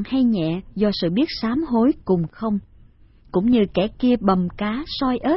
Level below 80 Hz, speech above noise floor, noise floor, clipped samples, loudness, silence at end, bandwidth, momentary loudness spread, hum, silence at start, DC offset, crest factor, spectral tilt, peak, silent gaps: -44 dBFS; 30 dB; -50 dBFS; under 0.1%; -21 LUFS; 0 s; 5.8 kHz; 7 LU; none; 0 s; under 0.1%; 16 dB; -11 dB/octave; -4 dBFS; none